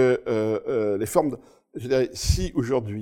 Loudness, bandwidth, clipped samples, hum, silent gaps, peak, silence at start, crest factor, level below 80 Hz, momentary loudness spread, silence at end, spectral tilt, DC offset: -24 LUFS; 17 kHz; under 0.1%; none; none; -4 dBFS; 0 s; 18 dB; -36 dBFS; 10 LU; 0 s; -5.5 dB/octave; under 0.1%